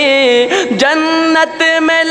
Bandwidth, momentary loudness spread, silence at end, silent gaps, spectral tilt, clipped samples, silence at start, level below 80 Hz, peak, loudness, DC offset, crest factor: 11.5 kHz; 2 LU; 0 s; none; -3 dB/octave; under 0.1%; 0 s; -58 dBFS; -2 dBFS; -10 LUFS; 0.1%; 10 dB